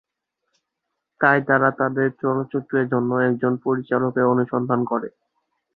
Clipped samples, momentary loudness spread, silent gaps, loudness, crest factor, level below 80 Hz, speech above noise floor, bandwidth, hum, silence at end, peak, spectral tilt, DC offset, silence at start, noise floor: under 0.1%; 6 LU; none; -21 LUFS; 20 dB; -64 dBFS; 60 dB; 4.3 kHz; none; 0.65 s; -2 dBFS; -10.5 dB/octave; under 0.1%; 1.2 s; -80 dBFS